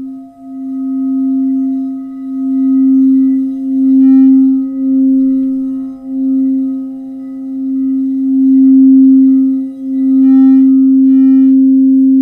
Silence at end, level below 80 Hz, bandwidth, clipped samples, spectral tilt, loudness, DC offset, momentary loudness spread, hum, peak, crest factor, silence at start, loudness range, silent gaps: 0 s; -58 dBFS; 2 kHz; under 0.1%; -9.5 dB/octave; -10 LUFS; under 0.1%; 15 LU; none; 0 dBFS; 8 dB; 0 s; 7 LU; none